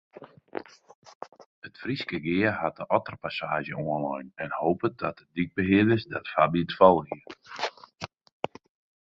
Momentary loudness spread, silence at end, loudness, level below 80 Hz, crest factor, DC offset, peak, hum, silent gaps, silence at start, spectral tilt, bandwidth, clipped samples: 20 LU; 1.05 s; -27 LUFS; -58 dBFS; 24 dB; under 0.1%; -4 dBFS; none; 0.95-1.02 s, 1.15-1.21 s, 1.46-1.62 s; 0.2 s; -7 dB/octave; 7.6 kHz; under 0.1%